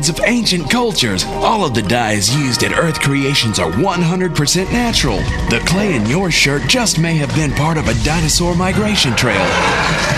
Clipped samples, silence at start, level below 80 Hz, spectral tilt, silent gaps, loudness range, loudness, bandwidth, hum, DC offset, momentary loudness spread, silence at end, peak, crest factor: under 0.1%; 0 s; -28 dBFS; -4 dB/octave; none; 1 LU; -14 LUFS; 14 kHz; none; under 0.1%; 3 LU; 0 s; 0 dBFS; 14 dB